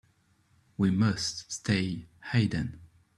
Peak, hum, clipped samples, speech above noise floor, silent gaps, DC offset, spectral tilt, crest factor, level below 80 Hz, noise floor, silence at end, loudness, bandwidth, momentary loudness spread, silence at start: -12 dBFS; none; under 0.1%; 39 dB; none; under 0.1%; -5 dB/octave; 20 dB; -56 dBFS; -67 dBFS; 0.3 s; -30 LUFS; 12 kHz; 12 LU; 0.8 s